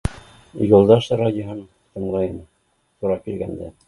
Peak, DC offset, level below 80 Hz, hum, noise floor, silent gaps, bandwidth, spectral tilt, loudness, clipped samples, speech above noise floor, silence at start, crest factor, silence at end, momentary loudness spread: 0 dBFS; under 0.1%; -40 dBFS; none; -66 dBFS; none; 11.5 kHz; -8 dB/octave; -20 LUFS; under 0.1%; 47 dB; 0.05 s; 20 dB; 0.2 s; 22 LU